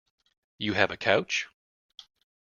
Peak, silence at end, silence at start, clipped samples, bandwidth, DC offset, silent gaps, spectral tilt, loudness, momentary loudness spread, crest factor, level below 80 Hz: -4 dBFS; 1 s; 0.6 s; under 0.1%; 7.2 kHz; under 0.1%; none; -3.5 dB/octave; -27 LUFS; 10 LU; 26 dB; -66 dBFS